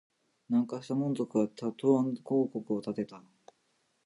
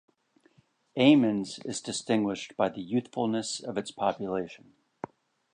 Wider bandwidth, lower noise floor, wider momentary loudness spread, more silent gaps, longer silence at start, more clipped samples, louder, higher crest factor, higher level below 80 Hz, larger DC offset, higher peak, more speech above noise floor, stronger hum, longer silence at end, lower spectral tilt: about the same, 11 kHz vs 10 kHz; first, -75 dBFS vs -65 dBFS; second, 8 LU vs 20 LU; neither; second, 0.5 s vs 0.95 s; neither; second, -32 LUFS vs -28 LUFS; about the same, 18 dB vs 20 dB; second, -80 dBFS vs -70 dBFS; neither; second, -14 dBFS vs -10 dBFS; first, 44 dB vs 37 dB; neither; about the same, 0.85 s vs 0.95 s; first, -8 dB/octave vs -5 dB/octave